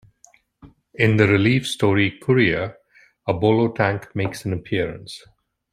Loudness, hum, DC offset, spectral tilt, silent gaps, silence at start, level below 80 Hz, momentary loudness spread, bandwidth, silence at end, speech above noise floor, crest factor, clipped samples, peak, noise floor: -20 LUFS; none; under 0.1%; -6.5 dB/octave; none; 0.65 s; -52 dBFS; 15 LU; 14.5 kHz; 0.55 s; 36 dB; 20 dB; under 0.1%; -2 dBFS; -56 dBFS